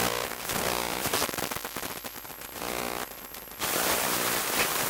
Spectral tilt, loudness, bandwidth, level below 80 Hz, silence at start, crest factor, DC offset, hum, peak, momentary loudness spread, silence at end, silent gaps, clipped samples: -1.5 dB/octave; -29 LUFS; 19 kHz; -54 dBFS; 0 s; 20 dB; under 0.1%; none; -12 dBFS; 13 LU; 0 s; none; under 0.1%